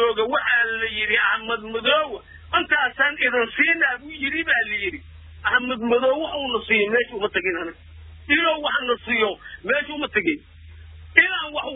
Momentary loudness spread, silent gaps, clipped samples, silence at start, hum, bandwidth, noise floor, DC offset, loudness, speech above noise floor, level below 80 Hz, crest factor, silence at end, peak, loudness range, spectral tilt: 8 LU; none; under 0.1%; 0 s; none; 4 kHz; -42 dBFS; under 0.1%; -21 LUFS; 20 dB; -50 dBFS; 22 dB; 0 s; 0 dBFS; 2 LU; -6.5 dB/octave